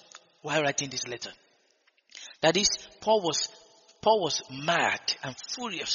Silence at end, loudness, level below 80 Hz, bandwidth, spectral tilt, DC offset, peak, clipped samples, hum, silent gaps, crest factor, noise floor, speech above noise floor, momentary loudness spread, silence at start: 0 s; -28 LUFS; -64 dBFS; 7.4 kHz; -1.5 dB/octave; under 0.1%; -8 dBFS; under 0.1%; none; none; 22 dB; -68 dBFS; 40 dB; 12 LU; 0.15 s